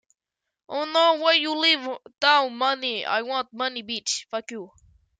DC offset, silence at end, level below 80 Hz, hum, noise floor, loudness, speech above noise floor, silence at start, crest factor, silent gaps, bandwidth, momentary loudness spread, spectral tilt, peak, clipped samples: under 0.1%; 0.55 s; -70 dBFS; none; -85 dBFS; -23 LUFS; 61 dB; 0.7 s; 20 dB; none; 9.6 kHz; 14 LU; -0.5 dB/octave; -6 dBFS; under 0.1%